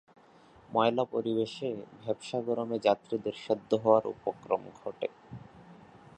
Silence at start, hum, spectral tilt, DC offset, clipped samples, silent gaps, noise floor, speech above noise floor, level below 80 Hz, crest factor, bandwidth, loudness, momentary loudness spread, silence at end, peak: 0.7 s; none; -6.5 dB/octave; under 0.1%; under 0.1%; none; -58 dBFS; 27 dB; -70 dBFS; 22 dB; 9.4 kHz; -31 LUFS; 12 LU; 0.45 s; -10 dBFS